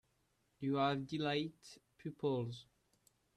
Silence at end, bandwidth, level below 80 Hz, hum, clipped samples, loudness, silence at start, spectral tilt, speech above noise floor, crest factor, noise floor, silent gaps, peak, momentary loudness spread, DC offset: 0.75 s; 12.5 kHz; -76 dBFS; none; under 0.1%; -39 LUFS; 0.6 s; -6.5 dB/octave; 40 dB; 18 dB; -79 dBFS; none; -24 dBFS; 17 LU; under 0.1%